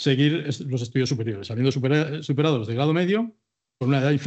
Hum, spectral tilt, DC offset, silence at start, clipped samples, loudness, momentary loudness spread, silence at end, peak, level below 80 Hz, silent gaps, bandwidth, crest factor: none; -6.5 dB/octave; under 0.1%; 0 s; under 0.1%; -24 LUFS; 7 LU; 0 s; -6 dBFS; -70 dBFS; none; 8.2 kHz; 16 dB